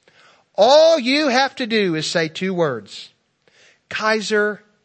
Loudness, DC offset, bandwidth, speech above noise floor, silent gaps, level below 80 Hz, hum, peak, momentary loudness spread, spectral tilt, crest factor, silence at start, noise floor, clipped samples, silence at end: -17 LUFS; under 0.1%; 8.8 kHz; 40 dB; none; -72 dBFS; none; -2 dBFS; 17 LU; -4 dB/octave; 18 dB; 0.6 s; -57 dBFS; under 0.1%; 0.3 s